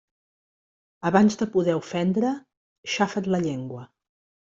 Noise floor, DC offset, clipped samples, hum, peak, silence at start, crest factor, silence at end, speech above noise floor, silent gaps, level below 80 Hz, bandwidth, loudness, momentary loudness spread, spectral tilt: under -90 dBFS; under 0.1%; under 0.1%; none; -4 dBFS; 1.05 s; 22 dB; 0.75 s; over 67 dB; 2.57-2.83 s; -64 dBFS; 7.8 kHz; -24 LUFS; 16 LU; -6 dB/octave